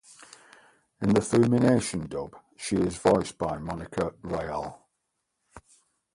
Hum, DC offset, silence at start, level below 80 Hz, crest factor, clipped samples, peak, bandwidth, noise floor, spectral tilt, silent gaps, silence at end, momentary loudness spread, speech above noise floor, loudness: none; under 0.1%; 1 s; -52 dBFS; 20 dB; under 0.1%; -8 dBFS; 11.5 kHz; -80 dBFS; -6 dB/octave; none; 0.55 s; 14 LU; 54 dB; -27 LUFS